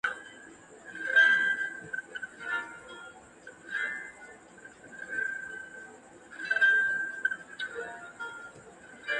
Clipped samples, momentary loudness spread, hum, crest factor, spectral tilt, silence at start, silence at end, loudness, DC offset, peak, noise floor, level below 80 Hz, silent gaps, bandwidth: under 0.1%; 27 LU; none; 20 dB; -1.5 dB/octave; 0.05 s; 0 s; -29 LUFS; under 0.1%; -12 dBFS; -52 dBFS; -74 dBFS; none; 11 kHz